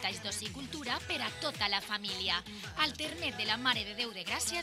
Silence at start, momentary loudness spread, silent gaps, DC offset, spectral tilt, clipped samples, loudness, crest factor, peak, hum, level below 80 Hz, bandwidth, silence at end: 0 s; 6 LU; none; under 0.1%; -1.5 dB/octave; under 0.1%; -34 LUFS; 22 dB; -14 dBFS; none; -60 dBFS; 16 kHz; 0 s